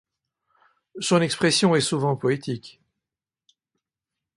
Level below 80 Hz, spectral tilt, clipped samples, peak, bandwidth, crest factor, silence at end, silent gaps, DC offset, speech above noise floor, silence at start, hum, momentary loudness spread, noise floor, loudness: -66 dBFS; -4.5 dB/octave; under 0.1%; -6 dBFS; 11.5 kHz; 20 dB; 1.7 s; none; under 0.1%; 66 dB; 0.95 s; none; 12 LU; -88 dBFS; -22 LUFS